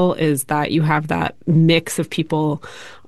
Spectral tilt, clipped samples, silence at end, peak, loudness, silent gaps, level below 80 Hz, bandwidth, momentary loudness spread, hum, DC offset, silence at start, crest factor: -5.5 dB/octave; under 0.1%; 0.1 s; -2 dBFS; -18 LUFS; none; -50 dBFS; 12.5 kHz; 8 LU; none; under 0.1%; 0 s; 18 dB